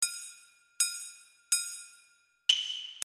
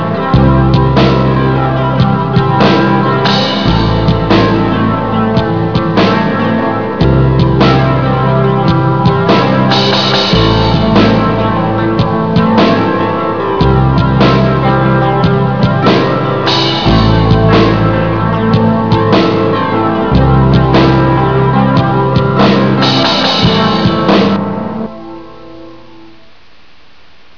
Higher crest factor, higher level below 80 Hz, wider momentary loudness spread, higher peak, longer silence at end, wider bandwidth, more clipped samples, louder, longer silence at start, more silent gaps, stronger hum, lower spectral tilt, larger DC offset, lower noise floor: first, 28 dB vs 10 dB; second, -84 dBFS vs -24 dBFS; first, 18 LU vs 4 LU; second, -8 dBFS vs 0 dBFS; second, 0 s vs 1.6 s; first, 13.5 kHz vs 5.4 kHz; second, under 0.1% vs 0.3%; second, -30 LUFS vs -10 LUFS; about the same, 0 s vs 0 s; neither; neither; second, 6 dB/octave vs -7.5 dB/octave; second, under 0.1% vs 2%; first, -66 dBFS vs -44 dBFS